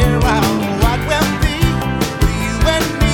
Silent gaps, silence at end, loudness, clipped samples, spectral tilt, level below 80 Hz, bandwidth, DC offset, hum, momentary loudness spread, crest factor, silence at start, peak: none; 0 s; -16 LUFS; under 0.1%; -5 dB/octave; -20 dBFS; 19 kHz; under 0.1%; none; 3 LU; 14 dB; 0 s; 0 dBFS